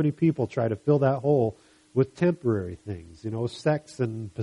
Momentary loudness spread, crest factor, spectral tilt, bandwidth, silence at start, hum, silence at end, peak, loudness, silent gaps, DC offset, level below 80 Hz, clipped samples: 12 LU; 16 dB; -8.5 dB/octave; 11 kHz; 0 s; none; 0 s; -10 dBFS; -26 LUFS; none; under 0.1%; -60 dBFS; under 0.1%